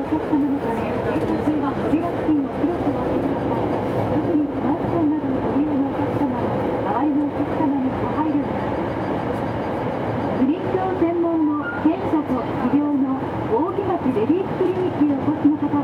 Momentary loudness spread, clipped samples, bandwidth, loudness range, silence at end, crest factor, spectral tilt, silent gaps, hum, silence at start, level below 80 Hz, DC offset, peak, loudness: 4 LU; under 0.1%; 6.2 kHz; 2 LU; 0 s; 14 dB; -9 dB/octave; none; none; 0 s; -44 dBFS; under 0.1%; -6 dBFS; -21 LUFS